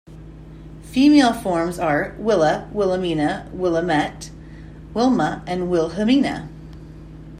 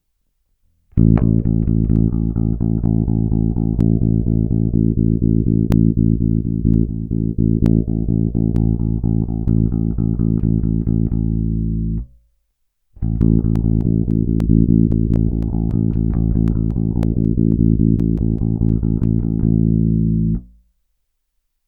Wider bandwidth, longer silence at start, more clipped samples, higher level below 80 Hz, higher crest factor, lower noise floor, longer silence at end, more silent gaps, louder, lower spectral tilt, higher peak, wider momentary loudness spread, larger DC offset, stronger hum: first, 15 kHz vs 2.5 kHz; second, 0.1 s vs 0.95 s; neither; second, -42 dBFS vs -24 dBFS; about the same, 18 dB vs 16 dB; second, -39 dBFS vs -70 dBFS; second, 0 s vs 1.25 s; neither; second, -20 LUFS vs -17 LUFS; second, -6 dB/octave vs -12.5 dB/octave; second, -4 dBFS vs 0 dBFS; first, 24 LU vs 5 LU; neither; neither